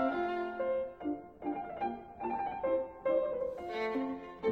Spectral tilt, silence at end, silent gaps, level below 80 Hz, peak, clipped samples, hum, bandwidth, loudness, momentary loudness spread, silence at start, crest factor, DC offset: -7 dB/octave; 0 s; none; -64 dBFS; -20 dBFS; under 0.1%; none; 6.4 kHz; -36 LUFS; 7 LU; 0 s; 16 dB; under 0.1%